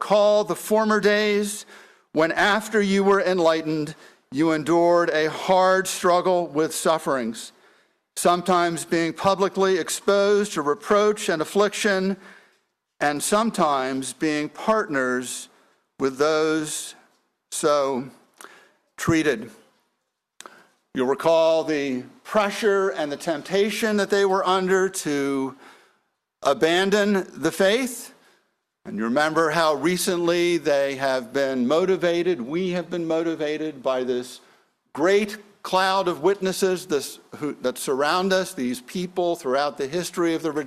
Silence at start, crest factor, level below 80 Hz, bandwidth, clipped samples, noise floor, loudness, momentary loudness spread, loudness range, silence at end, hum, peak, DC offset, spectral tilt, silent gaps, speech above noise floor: 0 s; 16 dB; -64 dBFS; 15 kHz; under 0.1%; -77 dBFS; -22 LUFS; 10 LU; 4 LU; 0 s; none; -6 dBFS; under 0.1%; -4 dB/octave; none; 55 dB